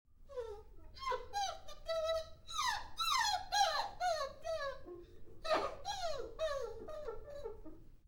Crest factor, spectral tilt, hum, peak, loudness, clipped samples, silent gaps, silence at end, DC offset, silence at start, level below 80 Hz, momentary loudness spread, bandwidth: 18 dB; -1.5 dB/octave; none; -22 dBFS; -39 LUFS; under 0.1%; none; 0.1 s; under 0.1%; 0.1 s; -56 dBFS; 17 LU; 19.5 kHz